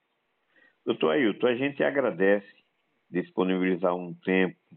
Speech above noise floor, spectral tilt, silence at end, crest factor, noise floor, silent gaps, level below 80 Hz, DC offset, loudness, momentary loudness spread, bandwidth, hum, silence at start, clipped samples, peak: 49 dB; -4.5 dB/octave; 0 s; 16 dB; -75 dBFS; none; -84 dBFS; under 0.1%; -27 LUFS; 8 LU; 4.1 kHz; none; 0.85 s; under 0.1%; -10 dBFS